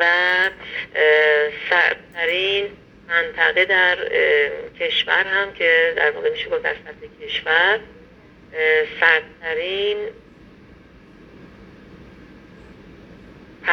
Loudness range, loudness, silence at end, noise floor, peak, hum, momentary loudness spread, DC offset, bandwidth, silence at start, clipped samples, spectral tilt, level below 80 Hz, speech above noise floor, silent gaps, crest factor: 6 LU; -18 LUFS; 0 s; -47 dBFS; 0 dBFS; none; 12 LU; under 0.1%; 6.6 kHz; 0 s; under 0.1%; -3.5 dB/octave; -54 dBFS; 28 dB; none; 20 dB